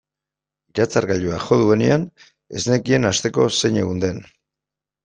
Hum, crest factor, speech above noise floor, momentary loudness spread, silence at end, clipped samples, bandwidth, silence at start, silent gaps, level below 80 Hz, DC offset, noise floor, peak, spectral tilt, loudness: none; 18 dB; 68 dB; 11 LU; 0.8 s; under 0.1%; 9.8 kHz; 0.75 s; none; -52 dBFS; under 0.1%; -87 dBFS; -2 dBFS; -5 dB/octave; -19 LUFS